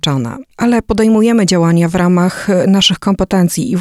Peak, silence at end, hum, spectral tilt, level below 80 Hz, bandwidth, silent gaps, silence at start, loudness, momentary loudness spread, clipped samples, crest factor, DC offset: 0 dBFS; 0 s; none; -5.5 dB/octave; -36 dBFS; 14 kHz; none; 0.05 s; -12 LUFS; 6 LU; under 0.1%; 12 dB; under 0.1%